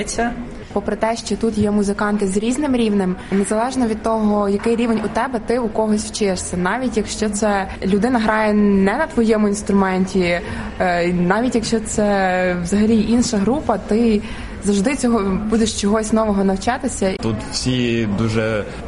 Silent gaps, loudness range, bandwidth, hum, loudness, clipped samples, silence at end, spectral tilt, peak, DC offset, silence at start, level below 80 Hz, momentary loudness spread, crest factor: none; 2 LU; 11.5 kHz; none; -18 LUFS; under 0.1%; 0 s; -5.5 dB/octave; 0 dBFS; under 0.1%; 0 s; -36 dBFS; 5 LU; 16 dB